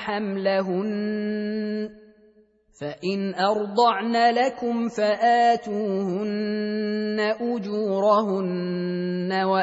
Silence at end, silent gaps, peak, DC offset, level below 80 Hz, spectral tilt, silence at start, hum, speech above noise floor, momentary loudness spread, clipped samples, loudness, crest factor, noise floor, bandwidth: 0 s; none; -6 dBFS; under 0.1%; -68 dBFS; -6.5 dB/octave; 0 s; none; 35 dB; 8 LU; under 0.1%; -24 LUFS; 16 dB; -58 dBFS; 8 kHz